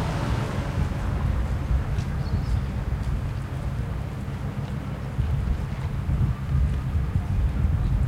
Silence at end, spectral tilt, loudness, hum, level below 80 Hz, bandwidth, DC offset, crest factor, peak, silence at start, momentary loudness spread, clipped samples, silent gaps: 0 s; -7.5 dB/octave; -28 LUFS; none; -28 dBFS; 12.5 kHz; under 0.1%; 14 dB; -12 dBFS; 0 s; 6 LU; under 0.1%; none